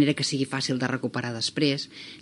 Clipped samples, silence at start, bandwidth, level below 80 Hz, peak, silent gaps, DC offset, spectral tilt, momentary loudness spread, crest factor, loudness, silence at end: under 0.1%; 0 s; 11.5 kHz; -72 dBFS; -10 dBFS; none; under 0.1%; -4.5 dB/octave; 6 LU; 18 dB; -27 LUFS; 0 s